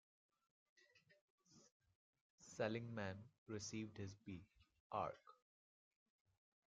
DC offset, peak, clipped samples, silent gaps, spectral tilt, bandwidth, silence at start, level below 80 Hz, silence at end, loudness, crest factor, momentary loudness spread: under 0.1%; -28 dBFS; under 0.1%; 1.21-1.38 s, 1.72-1.80 s, 1.95-2.13 s, 2.21-2.38 s, 3.38-3.46 s, 4.80-4.90 s; -5 dB/octave; 7.4 kHz; 0.95 s; -84 dBFS; 1.35 s; -50 LUFS; 24 dB; 13 LU